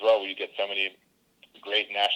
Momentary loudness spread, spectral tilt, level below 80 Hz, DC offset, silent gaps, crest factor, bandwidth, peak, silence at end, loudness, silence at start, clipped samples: 8 LU; -1.5 dB/octave; -76 dBFS; under 0.1%; none; 16 dB; 11.5 kHz; -12 dBFS; 0 s; -27 LUFS; 0 s; under 0.1%